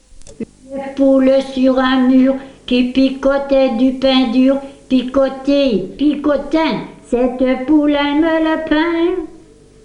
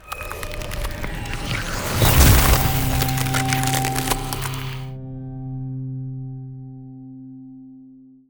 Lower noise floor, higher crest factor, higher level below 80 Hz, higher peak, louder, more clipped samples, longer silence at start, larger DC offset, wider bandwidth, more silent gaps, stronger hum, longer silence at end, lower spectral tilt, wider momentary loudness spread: second, -42 dBFS vs -46 dBFS; second, 14 dB vs 20 dB; second, -40 dBFS vs -28 dBFS; about the same, -2 dBFS vs -2 dBFS; first, -14 LUFS vs -21 LUFS; neither; first, 0.2 s vs 0.05 s; neither; second, 9.8 kHz vs over 20 kHz; neither; first, 50 Hz at -50 dBFS vs none; first, 0.5 s vs 0.25 s; first, -6 dB/octave vs -4 dB/octave; second, 11 LU vs 24 LU